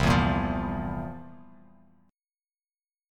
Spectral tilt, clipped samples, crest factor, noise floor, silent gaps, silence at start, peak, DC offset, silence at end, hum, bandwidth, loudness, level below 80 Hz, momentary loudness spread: -6.5 dB/octave; under 0.1%; 20 dB; under -90 dBFS; none; 0 s; -10 dBFS; under 0.1%; 1.7 s; none; 15 kHz; -28 LUFS; -40 dBFS; 21 LU